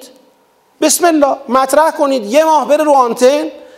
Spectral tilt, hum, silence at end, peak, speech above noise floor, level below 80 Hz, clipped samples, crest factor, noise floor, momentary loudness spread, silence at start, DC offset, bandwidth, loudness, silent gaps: -2 dB/octave; none; 0.15 s; 0 dBFS; 42 dB; -58 dBFS; under 0.1%; 12 dB; -53 dBFS; 4 LU; 0 s; under 0.1%; 16.5 kHz; -11 LUFS; none